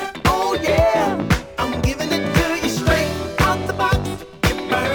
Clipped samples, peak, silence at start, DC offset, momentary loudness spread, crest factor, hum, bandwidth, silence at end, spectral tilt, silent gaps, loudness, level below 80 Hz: under 0.1%; -2 dBFS; 0 s; under 0.1%; 5 LU; 16 dB; none; over 20 kHz; 0 s; -5 dB/octave; none; -19 LUFS; -30 dBFS